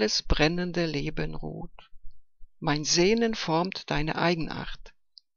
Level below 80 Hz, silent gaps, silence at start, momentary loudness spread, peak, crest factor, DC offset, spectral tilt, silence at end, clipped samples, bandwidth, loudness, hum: -38 dBFS; none; 0 s; 17 LU; -8 dBFS; 20 dB; under 0.1%; -4 dB/octave; 0.45 s; under 0.1%; 7.4 kHz; -27 LUFS; none